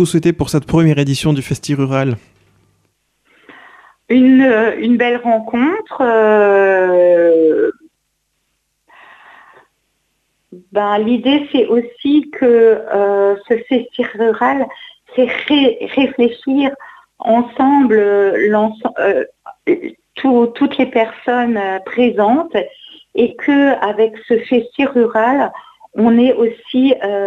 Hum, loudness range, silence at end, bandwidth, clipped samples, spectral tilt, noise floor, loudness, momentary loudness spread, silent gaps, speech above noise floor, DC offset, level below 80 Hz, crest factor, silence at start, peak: none; 6 LU; 0 s; 12.5 kHz; under 0.1%; -6.5 dB/octave; -67 dBFS; -14 LUFS; 9 LU; none; 55 dB; under 0.1%; -50 dBFS; 12 dB; 0 s; -2 dBFS